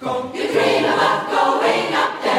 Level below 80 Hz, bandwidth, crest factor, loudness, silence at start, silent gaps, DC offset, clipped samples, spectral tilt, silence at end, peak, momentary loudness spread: -62 dBFS; 16 kHz; 14 dB; -18 LUFS; 0 s; none; under 0.1%; under 0.1%; -4 dB/octave; 0 s; -4 dBFS; 5 LU